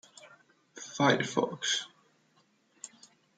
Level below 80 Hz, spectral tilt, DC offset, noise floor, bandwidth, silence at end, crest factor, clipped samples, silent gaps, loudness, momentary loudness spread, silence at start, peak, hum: -82 dBFS; -3.5 dB/octave; under 0.1%; -69 dBFS; 10 kHz; 0.5 s; 24 dB; under 0.1%; none; -29 LUFS; 22 LU; 0.2 s; -10 dBFS; none